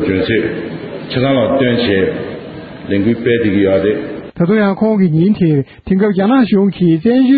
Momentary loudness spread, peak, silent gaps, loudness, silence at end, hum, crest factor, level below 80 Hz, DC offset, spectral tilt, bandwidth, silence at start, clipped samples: 12 LU; 0 dBFS; none; -13 LUFS; 0 s; none; 12 dB; -44 dBFS; under 0.1%; -6 dB/octave; 4.9 kHz; 0 s; under 0.1%